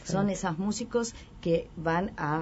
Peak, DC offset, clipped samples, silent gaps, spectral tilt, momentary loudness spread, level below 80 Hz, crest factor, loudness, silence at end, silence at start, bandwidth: -14 dBFS; under 0.1%; under 0.1%; none; -5.5 dB/octave; 3 LU; -50 dBFS; 16 dB; -30 LUFS; 0 s; 0 s; 8 kHz